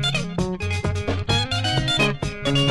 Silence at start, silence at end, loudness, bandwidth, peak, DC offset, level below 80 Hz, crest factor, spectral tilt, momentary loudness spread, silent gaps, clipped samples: 0 s; 0 s; -22 LUFS; 11.5 kHz; -6 dBFS; under 0.1%; -38 dBFS; 16 dB; -4.5 dB/octave; 6 LU; none; under 0.1%